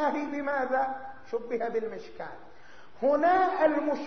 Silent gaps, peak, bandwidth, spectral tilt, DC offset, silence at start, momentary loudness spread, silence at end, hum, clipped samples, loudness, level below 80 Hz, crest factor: none; -12 dBFS; 6.4 kHz; -3 dB/octave; 0.5%; 0 s; 17 LU; 0 s; none; under 0.1%; -28 LUFS; -68 dBFS; 16 dB